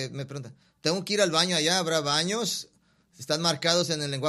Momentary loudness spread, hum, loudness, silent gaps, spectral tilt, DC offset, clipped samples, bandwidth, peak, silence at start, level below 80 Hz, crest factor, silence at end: 13 LU; none; -25 LUFS; none; -3 dB/octave; under 0.1%; under 0.1%; 14.5 kHz; -6 dBFS; 0 s; -70 dBFS; 22 dB; 0 s